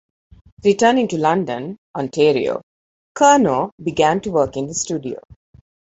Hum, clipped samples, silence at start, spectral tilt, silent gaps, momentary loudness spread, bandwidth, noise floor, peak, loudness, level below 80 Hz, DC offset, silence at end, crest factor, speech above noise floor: none; under 0.1%; 0.65 s; -4.5 dB/octave; 1.78-1.94 s, 2.63-3.15 s, 3.72-3.78 s; 15 LU; 8.2 kHz; under -90 dBFS; -2 dBFS; -18 LUFS; -52 dBFS; under 0.1%; 0.65 s; 18 dB; over 73 dB